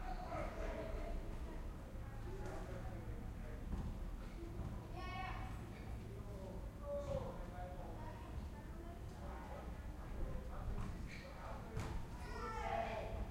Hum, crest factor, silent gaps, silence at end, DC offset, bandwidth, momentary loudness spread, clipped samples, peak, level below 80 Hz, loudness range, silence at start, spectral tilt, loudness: none; 16 dB; none; 0 s; under 0.1%; 16 kHz; 6 LU; under 0.1%; -30 dBFS; -50 dBFS; 2 LU; 0 s; -6.5 dB/octave; -49 LUFS